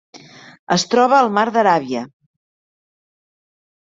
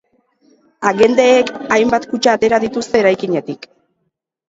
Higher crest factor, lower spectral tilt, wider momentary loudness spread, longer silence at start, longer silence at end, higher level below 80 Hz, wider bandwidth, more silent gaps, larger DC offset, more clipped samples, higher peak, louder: about the same, 18 dB vs 16 dB; about the same, -4 dB/octave vs -4.5 dB/octave; first, 13 LU vs 9 LU; second, 0.15 s vs 0.8 s; first, 1.9 s vs 0.95 s; second, -64 dBFS vs -54 dBFS; about the same, 7.8 kHz vs 7.8 kHz; first, 0.59-0.67 s vs none; neither; neither; about the same, -2 dBFS vs 0 dBFS; about the same, -16 LUFS vs -14 LUFS